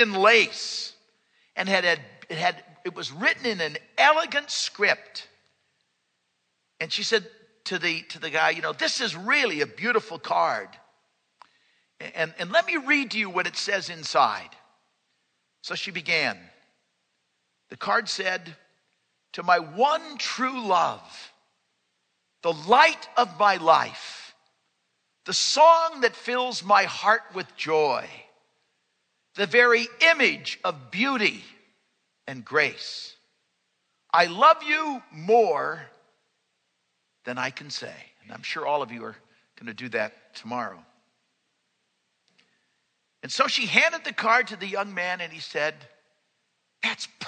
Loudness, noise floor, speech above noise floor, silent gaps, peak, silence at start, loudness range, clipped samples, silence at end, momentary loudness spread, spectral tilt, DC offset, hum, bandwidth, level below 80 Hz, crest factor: -23 LUFS; -75 dBFS; 51 dB; none; 0 dBFS; 0 s; 10 LU; under 0.1%; 0 s; 19 LU; -2.5 dB/octave; under 0.1%; none; 9.4 kHz; -84 dBFS; 26 dB